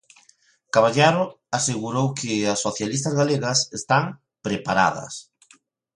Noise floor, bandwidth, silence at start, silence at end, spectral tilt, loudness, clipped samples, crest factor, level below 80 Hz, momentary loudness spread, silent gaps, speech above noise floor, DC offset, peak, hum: -60 dBFS; 11.5 kHz; 0.75 s; 0.75 s; -4 dB/octave; -22 LUFS; under 0.1%; 20 dB; -60 dBFS; 12 LU; none; 38 dB; under 0.1%; -4 dBFS; none